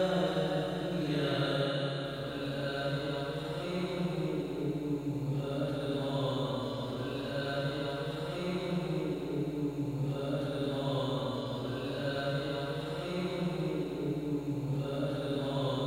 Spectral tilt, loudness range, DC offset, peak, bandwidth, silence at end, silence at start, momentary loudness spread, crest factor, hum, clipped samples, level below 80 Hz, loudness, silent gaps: -7 dB/octave; 1 LU; under 0.1%; -20 dBFS; 16 kHz; 0 s; 0 s; 5 LU; 14 dB; none; under 0.1%; -58 dBFS; -34 LUFS; none